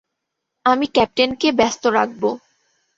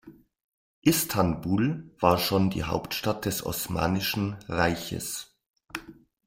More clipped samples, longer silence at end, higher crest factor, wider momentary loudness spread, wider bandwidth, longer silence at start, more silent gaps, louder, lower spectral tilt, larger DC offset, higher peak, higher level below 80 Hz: neither; first, 0.6 s vs 0.35 s; about the same, 20 dB vs 24 dB; second, 7 LU vs 11 LU; second, 7.8 kHz vs 16.5 kHz; first, 0.65 s vs 0.05 s; second, none vs 0.44-0.82 s, 5.50-5.54 s; first, -18 LUFS vs -27 LUFS; about the same, -3.5 dB/octave vs -4.5 dB/octave; neither; first, 0 dBFS vs -4 dBFS; about the same, -54 dBFS vs -52 dBFS